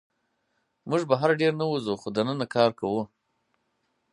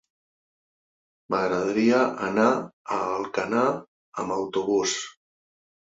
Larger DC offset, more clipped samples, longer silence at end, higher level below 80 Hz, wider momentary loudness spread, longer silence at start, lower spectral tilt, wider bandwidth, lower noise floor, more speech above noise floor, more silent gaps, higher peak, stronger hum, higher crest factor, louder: neither; neither; first, 1.05 s vs 0.85 s; about the same, -68 dBFS vs -66 dBFS; about the same, 8 LU vs 10 LU; second, 0.85 s vs 1.3 s; first, -6.5 dB/octave vs -4 dB/octave; first, 11 kHz vs 7.8 kHz; second, -75 dBFS vs under -90 dBFS; second, 50 dB vs over 66 dB; second, none vs 2.73-2.85 s, 3.88-4.12 s; about the same, -6 dBFS vs -8 dBFS; neither; about the same, 22 dB vs 18 dB; about the same, -26 LUFS vs -25 LUFS